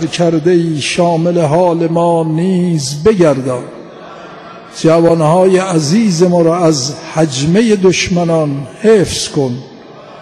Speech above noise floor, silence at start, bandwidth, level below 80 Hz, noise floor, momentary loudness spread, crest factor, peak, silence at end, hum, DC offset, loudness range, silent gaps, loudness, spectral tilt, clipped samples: 23 dB; 0 s; 12.5 kHz; -44 dBFS; -33 dBFS; 15 LU; 12 dB; 0 dBFS; 0 s; none; under 0.1%; 3 LU; none; -11 LUFS; -5.5 dB/octave; under 0.1%